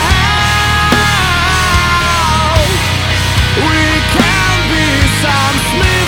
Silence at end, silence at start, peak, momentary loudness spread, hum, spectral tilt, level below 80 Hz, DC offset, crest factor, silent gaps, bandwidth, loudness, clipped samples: 0 s; 0 s; 0 dBFS; 2 LU; none; -4 dB/octave; -20 dBFS; under 0.1%; 10 dB; none; 19 kHz; -10 LUFS; under 0.1%